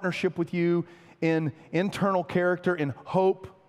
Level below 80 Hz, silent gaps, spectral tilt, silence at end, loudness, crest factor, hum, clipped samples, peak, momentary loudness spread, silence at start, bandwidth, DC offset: -68 dBFS; none; -7.5 dB/octave; 0.2 s; -27 LUFS; 16 dB; none; under 0.1%; -10 dBFS; 5 LU; 0 s; 12.5 kHz; under 0.1%